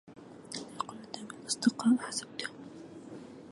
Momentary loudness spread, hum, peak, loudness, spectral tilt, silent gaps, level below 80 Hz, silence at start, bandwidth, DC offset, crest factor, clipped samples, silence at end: 20 LU; none; -14 dBFS; -34 LUFS; -3 dB/octave; none; -76 dBFS; 0.05 s; 11.5 kHz; under 0.1%; 22 dB; under 0.1%; 0 s